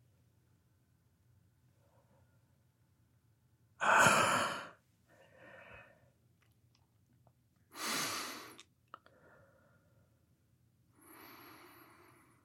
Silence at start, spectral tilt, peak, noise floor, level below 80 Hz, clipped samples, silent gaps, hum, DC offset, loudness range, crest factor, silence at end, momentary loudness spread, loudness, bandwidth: 3.8 s; -2 dB/octave; -14 dBFS; -73 dBFS; -80 dBFS; under 0.1%; none; none; under 0.1%; 13 LU; 28 dB; 0.95 s; 29 LU; -32 LUFS; 16.5 kHz